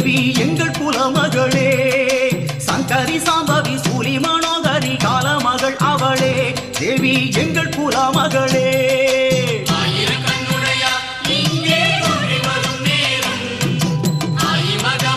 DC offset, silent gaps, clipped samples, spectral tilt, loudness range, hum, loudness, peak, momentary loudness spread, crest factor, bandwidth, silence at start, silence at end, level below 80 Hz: under 0.1%; none; under 0.1%; -4 dB/octave; 1 LU; none; -16 LUFS; -2 dBFS; 4 LU; 14 dB; 14 kHz; 0 s; 0 s; -48 dBFS